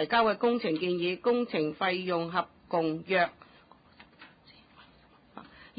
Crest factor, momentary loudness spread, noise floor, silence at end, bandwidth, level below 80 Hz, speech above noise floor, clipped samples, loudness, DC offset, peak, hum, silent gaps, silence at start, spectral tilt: 18 dB; 7 LU; -60 dBFS; 0.15 s; 5 kHz; -68 dBFS; 31 dB; under 0.1%; -29 LUFS; under 0.1%; -14 dBFS; none; none; 0 s; -9 dB/octave